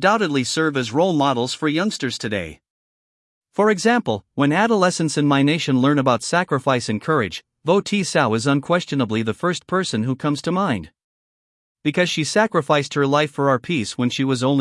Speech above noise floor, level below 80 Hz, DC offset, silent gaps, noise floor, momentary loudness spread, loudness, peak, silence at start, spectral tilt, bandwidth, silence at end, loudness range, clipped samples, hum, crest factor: over 71 dB; -62 dBFS; under 0.1%; 2.70-3.41 s, 11.04-11.75 s; under -90 dBFS; 6 LU; -20 LUFS; -2 dBFS; 0 s; -5 dB/octave; 12 kHz; 0 s; 4 LU; under 0.1%; none; 18 dB